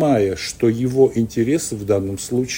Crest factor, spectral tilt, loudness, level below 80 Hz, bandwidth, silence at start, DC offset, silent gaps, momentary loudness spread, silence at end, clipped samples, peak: 16 dB; -5.5 dB/octave; -19 LUFS; -48 dBFS; 16.5 kHz; 0 s; under 0.1%; none; 5 LU; 0 s; under 0.1%; -2 dBFS